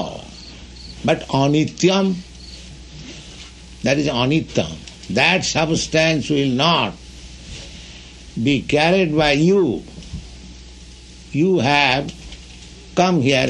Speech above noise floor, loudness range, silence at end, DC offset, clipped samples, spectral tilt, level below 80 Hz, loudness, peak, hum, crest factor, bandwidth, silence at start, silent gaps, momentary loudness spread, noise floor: 23 dB; 3 LU; 0 s; under 0.1%; under 0.1%; -5 dB/octave; -42 dBFS; -18 LUFS; -2 dBFS; none; 18 dB; 11 kHz; 0 s; none; 22 LU; -40 dBFS